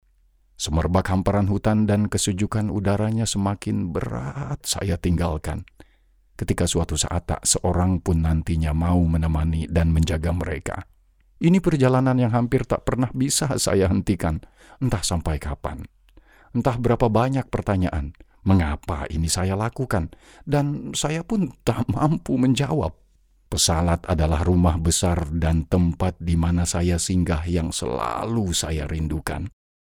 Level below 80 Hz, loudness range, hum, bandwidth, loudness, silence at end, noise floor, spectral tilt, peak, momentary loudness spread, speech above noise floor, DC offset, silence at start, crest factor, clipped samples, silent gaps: -34 dBFS; 3 LU; none; 16.5 kHz; -23 LUFS; 0.35 s; -60 dBFS; -5.5 dB/octave; -6 dBFS; 9 LU; 38 dB; under 0.1%; 0.6 s; 18 dB; under 0.1%; none